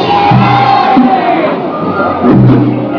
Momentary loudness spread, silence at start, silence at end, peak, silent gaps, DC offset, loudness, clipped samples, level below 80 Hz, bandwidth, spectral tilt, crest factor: 7 LU; 0 s; 0 s; 0 dBFS; none; under 0.1%; -8 LUFS; 2%; -38 dBFS; 5.4 kHz; -9 dB/octave; 8 dB